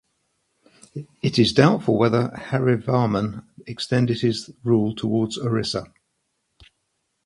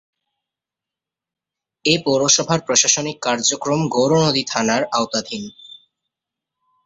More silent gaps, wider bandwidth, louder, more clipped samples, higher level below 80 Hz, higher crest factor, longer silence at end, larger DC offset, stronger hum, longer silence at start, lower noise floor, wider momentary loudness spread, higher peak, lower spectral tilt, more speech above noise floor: neither; first, 11.5 kHz vs 8.4 kHz; second, -21 LUFS vs -17 LUFS; neither; first, -54 dBFS vs -60 dBFS; about the same, 22 dB vs 20 dB; first, 1.4 s vs 1.15 s; neither; neither; second, 0.95 s vs 1.85 s; second, -74 dBFS vs -87 dBFS; first, 14 LU vs 9 LU; about the same, 0 dBFS vs 0 dBFS; first, -6.5 dB/octave vs -3 dB/octave; second, 53 dB vs 69 dB